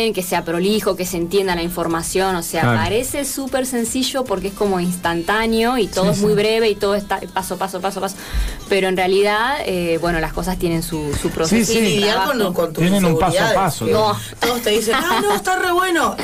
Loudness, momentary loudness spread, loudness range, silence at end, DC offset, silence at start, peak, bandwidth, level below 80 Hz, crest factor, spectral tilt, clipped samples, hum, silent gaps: -18 LUFS; 7 LU; 3 LU; 0 s; 0.2%; 0 s; -8 dBFS; 16 kHz; -36 dBFS; 10 dB; -4.5 dB/octave; under 0.1%; none; none